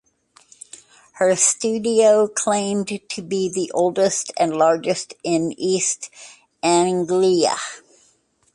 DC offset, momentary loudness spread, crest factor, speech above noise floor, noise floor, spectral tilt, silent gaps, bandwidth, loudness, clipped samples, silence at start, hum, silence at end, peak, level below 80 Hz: under 0.1%; 12 LU; 18 dB; 42 dB; -61 dBFS; -3.5 dB/octave; none; 11.5 kHz; -19 LUFS; under 0.1%; 1.15 s; none; 0.75 s; -4 dBFS; -66 dBFS